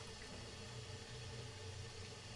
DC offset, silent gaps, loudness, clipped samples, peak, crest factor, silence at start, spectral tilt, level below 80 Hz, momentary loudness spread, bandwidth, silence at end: under 0.1%; none; -51 LUFS; under 0.1%; -38 dBFS; 12 dB; 0 s; -3.5 dB/octave; -64 dBFS; 1 LU; 11.5 kHz; 0 s